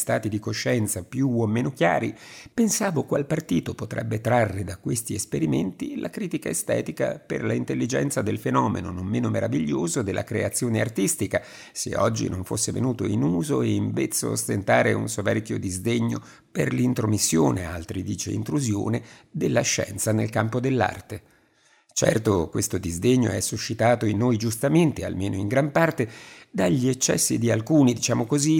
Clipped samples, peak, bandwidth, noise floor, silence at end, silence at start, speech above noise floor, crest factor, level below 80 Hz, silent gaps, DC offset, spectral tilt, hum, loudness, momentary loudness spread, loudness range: under 0.1%; -4 dBFS; 19 kHz; -61 dBFS; 0 s; 0 s; 37 dB; 20 dB; -58 dBFS; none; under 0.1%; -5 dB/octave; none; -24 LUFS; 9 LU; 3 LU